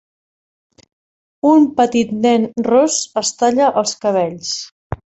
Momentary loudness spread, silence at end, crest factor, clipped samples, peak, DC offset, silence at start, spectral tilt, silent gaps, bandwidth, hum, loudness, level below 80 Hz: 10 LU; 0.1 s; 14 dB; under 0.1%; -2 dBFS; under 0.1%; 1.45 s; -4 dB/octave; 4.72-4.90 s; 8.2 kHz; none; -15 LUFS; -48 dBFS